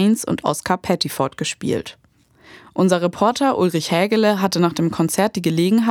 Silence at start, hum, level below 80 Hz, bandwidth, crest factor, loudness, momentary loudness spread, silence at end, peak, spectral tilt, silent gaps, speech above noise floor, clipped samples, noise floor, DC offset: 0 s; none; -56 dBFS; 18.5 kHz; 18 dB; -19 LUFS; 7 LU; 0 s; -2 dBFS; -5 dB/octave; none; 32 dB; under 0.1%; -51 dBFS; under 0.1%